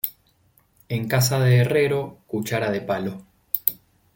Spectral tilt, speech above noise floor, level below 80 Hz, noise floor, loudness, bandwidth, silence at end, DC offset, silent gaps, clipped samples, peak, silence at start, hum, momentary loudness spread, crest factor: -5.5 dB/octave; 40 dB; -60 dBFS; -61 dBFS; -23 LUFS; 17 kHz; 0.4 s; under 0.1%; none; under 0.1%; 0 dBFS; 0.05 s; none; 12 LU; 24 dB